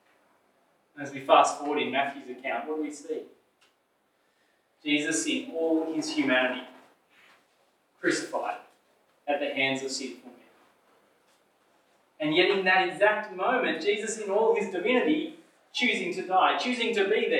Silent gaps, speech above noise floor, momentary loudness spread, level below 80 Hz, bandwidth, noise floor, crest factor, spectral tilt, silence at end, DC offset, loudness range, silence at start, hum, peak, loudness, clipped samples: none; 44 dB; 15 LU; under -90 dBFS; 13.5 kHz; -71 dBFS; 24 dB; -3 dB/octave; 0 s; under 0.1%; 8 LU; 0.95 s; none; -6 dBFS; -27 LUFS; under 0.1%